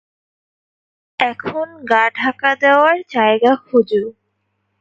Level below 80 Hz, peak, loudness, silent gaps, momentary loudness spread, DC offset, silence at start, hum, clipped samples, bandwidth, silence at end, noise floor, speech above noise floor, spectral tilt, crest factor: -64 dBFS; 0 dBFS; -15 LUFS; none; 12 LU; under 0.1%; 1.2 s; none; under 0.1%; 7.6 kHz; 0.7 s; -69 dBFS; 54 dB; -5.5 dB/octave; 16 dB